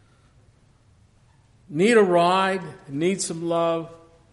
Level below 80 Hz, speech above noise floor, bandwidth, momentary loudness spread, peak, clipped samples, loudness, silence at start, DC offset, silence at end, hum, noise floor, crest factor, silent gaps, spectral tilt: -64 dBFS; 36 dB; 11.5 kHz; 15 LU; -6 dBFS; under 0.1%; -22 LUFS; 1.7 s; under 0.1%; 0.35 s; none; -57 dBFS; 18 dB; none; -4.5 dB/octave